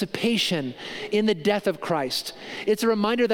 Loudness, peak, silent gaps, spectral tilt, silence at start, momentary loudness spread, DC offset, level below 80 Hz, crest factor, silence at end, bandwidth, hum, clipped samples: -25 LUFS; -8 dBFS; none; -4.5 dB/octave; 0 s; 8 LU; under 0.1%; -62 dBFS; 16 dB; 0 s; 17 kHz; none; under 0.1%